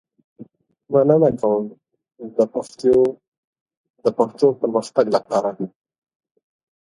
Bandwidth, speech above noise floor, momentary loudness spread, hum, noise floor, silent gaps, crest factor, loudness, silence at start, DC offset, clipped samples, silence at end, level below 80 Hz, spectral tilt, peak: 11 kHz; 27 dB; 12 LU; none; -45 dBFS; 3.28-3.53 s, 3.61-3.66 s, 3.77-3.84 s, 3.90-3.94 s; 20 dB; -19 LUFS; 0.4 s; under 0.1%; under 0.1%; 1.15 s; -60 dBFS; -7.5 dB/octave; 0 dBFS